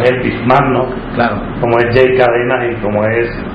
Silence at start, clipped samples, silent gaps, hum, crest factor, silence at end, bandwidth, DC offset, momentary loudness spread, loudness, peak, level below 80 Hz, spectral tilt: 0 s; 0.2%; none; none; 12 dB; 0 s; 5.6 kHz; under 0.1%; 6 LU; -13 LUFS; 0 dBFS; -32 dBFS; -8.5 dB/octave